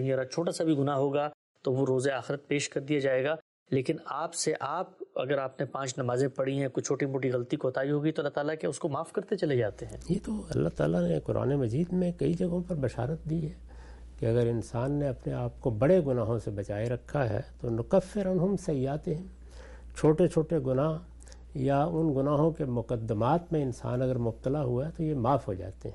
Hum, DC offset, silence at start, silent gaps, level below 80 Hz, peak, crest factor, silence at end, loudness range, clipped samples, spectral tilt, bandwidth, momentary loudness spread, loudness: none; under 0.1%; 0 s; 1.34-1.55 s, 3.42-3.66 s; -50 dBFS; -12 dBFS; 18 dB; 0 s; 2 LU; under 0.1%; -6.5 dB/octave; 11.5 kHz; 8 LU; -30 LUFS